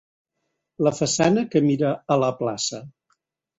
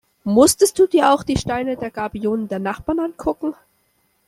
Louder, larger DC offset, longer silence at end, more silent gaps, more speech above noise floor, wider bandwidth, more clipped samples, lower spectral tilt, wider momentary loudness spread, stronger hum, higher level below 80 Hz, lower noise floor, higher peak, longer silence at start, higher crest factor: second, -22 LUFS vs -19 LUFS; neither; about the same, 0.7 s vs 0.75 s; neither; first, 56 dB vs 46 dB; second, 8.2 kHz vs 15.5 kHz; neither; about the same, -5 dB/octave vs -4.5 dB/octave; second, 8 LU vs 11 LU; neither; second, -62 dBFS vs -44 dBFS; first, -78 dBFS vs -64 dBFS; about the same, -4 dBFS vs -2 dBFS; first, 0.8 s vs 0.25 s; about the same, 18 dB vs 18 dB